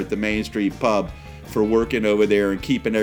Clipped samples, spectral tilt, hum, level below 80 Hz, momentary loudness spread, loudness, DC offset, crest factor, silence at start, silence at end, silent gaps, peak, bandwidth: under 0.1%; -6 dB/octave; none; -42 dBFS; 8 LU; -21 LUFS; under 0.1%; 16 dB; 0 s; 0 s; none; -6 dBFS; 18.5 kHz